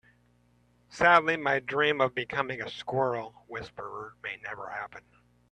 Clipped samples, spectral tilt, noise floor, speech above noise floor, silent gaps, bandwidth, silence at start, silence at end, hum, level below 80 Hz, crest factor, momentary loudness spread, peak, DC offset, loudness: under 0.1%; -5 dB/octave; -65 dBFS; 37 dB; none; 10.5 kHz; 0.9 s; 0.55 s; 60 Hz at -60 dBFS; -64 dBFS; 24 dB; 19 LU; -6 dBFS; under 0.1%; -28 LUFS